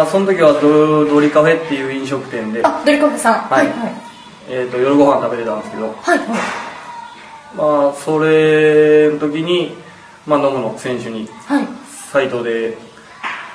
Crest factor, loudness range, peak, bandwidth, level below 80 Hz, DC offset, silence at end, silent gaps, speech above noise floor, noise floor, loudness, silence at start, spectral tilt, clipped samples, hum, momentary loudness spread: 14 dB; 6 LU; 0 dBFS; 11 kHz; -60 dBFS; under 0.1%; 0 s; none; 21 dB; -35 dBFS; -15 LUFS; 0 s; -5.5 dB/octave; under 0.1%; none; 17 LU